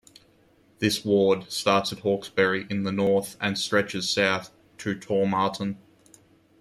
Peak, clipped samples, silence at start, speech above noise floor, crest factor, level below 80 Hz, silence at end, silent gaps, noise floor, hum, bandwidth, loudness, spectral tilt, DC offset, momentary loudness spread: -6 dBFS; under 0.1%; 0.8 s; 35 dB; 20 dB; -64 dBFS; 0.85 s; none; -60 dBFS; none; 15 kHz; -25 LUFS; -4.5 dB/octave; under 0.1%; 10 LU